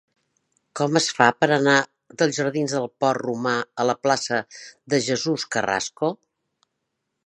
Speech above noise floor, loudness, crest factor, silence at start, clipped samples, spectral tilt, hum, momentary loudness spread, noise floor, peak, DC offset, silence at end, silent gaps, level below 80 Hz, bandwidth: 56 dB; -22 LUFS; 24 dB; 0.75 s; under 0.1%; -4 dB/octave; none; 9 LU; -78 dBFS; 0 dBFS; under 0.1%; 1.1 s; none; -68 dBFS; 11 kHz